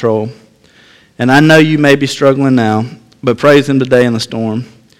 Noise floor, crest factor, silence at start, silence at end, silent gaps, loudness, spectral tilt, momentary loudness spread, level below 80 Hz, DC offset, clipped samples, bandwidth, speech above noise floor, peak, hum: -44 dBFS; 10 dB; 0 s; 0.35 s; none; -10 LUFS; -6 dB/octave; 12 LU; -50 dBFS; under 0.1%; 0.7%; 16 kHz; 35 dB; 0 dBFS; none